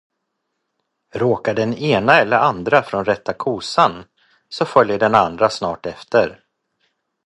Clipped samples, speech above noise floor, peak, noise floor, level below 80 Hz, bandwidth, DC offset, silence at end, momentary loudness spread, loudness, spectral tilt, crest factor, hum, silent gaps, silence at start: under 0.1%; 58 dB; 0 dBFS; -75 dBFS; -54 dBFS; 11 kHz; under 0.1%; 0.9 s; 11 LU; -17 LUFS; -5.5 dB/octave; 18 dB; none; none; 1.15 s